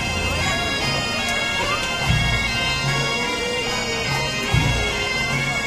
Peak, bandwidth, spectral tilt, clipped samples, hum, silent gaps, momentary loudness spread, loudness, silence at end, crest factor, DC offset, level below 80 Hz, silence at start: -6 dBFS; 15.5 kHz; -3.5 dB/octave; under 0.1%; none; none; 2 LU; -20 LUFS; 0 s; 16 dB; under 0.1%; -34 dBFS; 0 s